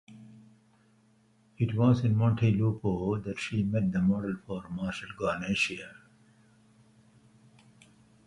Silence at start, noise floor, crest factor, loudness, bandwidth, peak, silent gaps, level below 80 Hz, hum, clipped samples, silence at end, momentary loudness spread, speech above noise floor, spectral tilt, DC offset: 0.1 s; -65 dBFS; 18 dB; -29 LUFS; 11.5 kHz; -12 dBFS; none; -56 dBFS; none; under 0.1%; 2.35 s; 11 LU; 36 dB; -7 dB/octave; under 0.1%